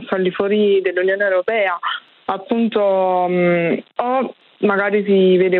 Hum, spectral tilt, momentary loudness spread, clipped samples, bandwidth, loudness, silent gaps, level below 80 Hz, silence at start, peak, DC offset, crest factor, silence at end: none; -9.5 dB/octave; 8 LU; under 0.1%; 4.3 kHz; -17 LUFS; none; -68 dBFS; 0 s; -4 dBFS; under 0.1%; 12 dB; 0 s